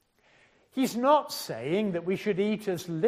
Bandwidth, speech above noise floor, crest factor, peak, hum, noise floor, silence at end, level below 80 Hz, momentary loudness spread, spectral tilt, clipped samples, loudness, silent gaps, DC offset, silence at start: 15.5 kHz; 36 dB; 18 dB; -10 dBFS; none; -63 dBFS; 0 s; -72 dBFS; 10 LU; -5.5 dB/octave; under 0.1%; -28 LUFS; none; under 0.1%; 0.75 s